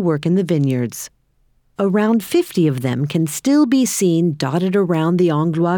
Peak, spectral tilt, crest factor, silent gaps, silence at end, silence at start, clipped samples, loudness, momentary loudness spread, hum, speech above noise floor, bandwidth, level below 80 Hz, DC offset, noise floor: -6 dBFS; -6 dB/octave; 10 dB; none; 0 s; 0 s; under 0.1%; -17 LUFS; 7 LU; none; 43 dB; over 20 kHz; -60 dBFS; under 0.1%; -59 dBFS